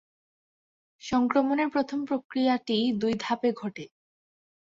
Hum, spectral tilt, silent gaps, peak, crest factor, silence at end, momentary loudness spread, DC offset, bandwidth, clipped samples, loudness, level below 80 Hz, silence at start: none; -5.5 dB/octave; 2.24-2.30 s; -10 dBFS; 18 dB; 0.9 s; 13 LU; under 0.1%; 7.6 kHz; under 0.1%; -27 LUFS; -66 dBFS; 1.05 s